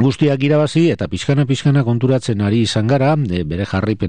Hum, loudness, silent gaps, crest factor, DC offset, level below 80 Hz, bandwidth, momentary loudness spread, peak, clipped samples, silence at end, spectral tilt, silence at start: none; -16 LUFS; none; 12 dB; 0.9%; -44 dBFS; 10 kHz; 5 LU; -4 dBFS; under 0.1%; 0 s; -7 dB/octave; 0 s